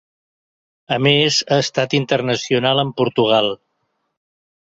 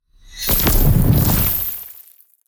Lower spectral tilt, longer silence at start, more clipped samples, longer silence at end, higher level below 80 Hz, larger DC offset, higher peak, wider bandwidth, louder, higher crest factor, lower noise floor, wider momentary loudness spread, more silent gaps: about the same, -4.5 dB/octave vs -5 dB/octave; first, 0.9 s vs 0.3 s; neither; first, 1.15 s vs 0.5 s; second, -58 dBFS vs -22 dBFS; neither; about the same, -2 dBFS vs -4 dBFS; second, 7.8 kHz vs over 20 kHz; about the same, -17 LUFS vs -16 LUFS; about the same, 16 dB vs 14 dB; first, -71 dBFS vs -46 dBFS; second, 5 LU vs 12 LU; neither